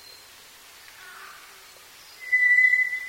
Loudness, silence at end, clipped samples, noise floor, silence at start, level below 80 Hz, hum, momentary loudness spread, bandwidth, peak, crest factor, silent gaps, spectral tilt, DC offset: -18 LUFS; 0 s; under 0.1%; -49 dBFS; 1 s; -72 dBFS; none; 27 LU; 16.5 kHz; -10 dBFS; 16 dB; none; 1.5 dB/octave; under 0.1%